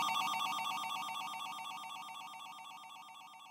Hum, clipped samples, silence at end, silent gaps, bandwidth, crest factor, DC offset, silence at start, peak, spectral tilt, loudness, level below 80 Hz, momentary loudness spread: none; under 0.1%; 0 s; none; 16 kHz; 16 dB; under 0.1%; 0 s; -24 dBFS; 0 dB/octave; -40 LUFS; under -90 dBFS; 16 LU